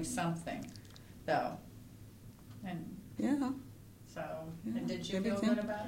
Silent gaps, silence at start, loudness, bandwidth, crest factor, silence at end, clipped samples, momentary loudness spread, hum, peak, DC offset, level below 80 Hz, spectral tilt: none; 0 s; -38 LUFS; 16.5 kHz; 18 dB; 0 s; under 0.1%; 21 LU; none; -20 dBFS; under 0.1%; -62 dBFS; -5.5 dB/octave